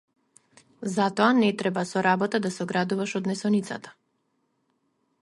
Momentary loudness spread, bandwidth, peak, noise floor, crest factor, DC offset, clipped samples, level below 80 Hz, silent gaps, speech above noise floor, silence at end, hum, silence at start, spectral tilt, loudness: 9 LU; 11.5 kHz; -6 dBFS; -73 dBFS; 20 dB; under 0.1%; under 0.1%; -72 dBFS; none; 48 dB; 1.3 s; none; 0.8 s; -5.5 dB/octave; -25 LUFS